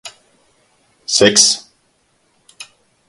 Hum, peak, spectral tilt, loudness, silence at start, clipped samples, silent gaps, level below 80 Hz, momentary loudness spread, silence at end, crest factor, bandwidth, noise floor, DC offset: none; 0 dBFS; -1 dB/octave; -11 LUFS; 0.05 s; under 0.1%; none; -56 dBFS; 24 LU; 0.45 s; 20 dB; 16 kHz; -60 dBFS; under 0.1%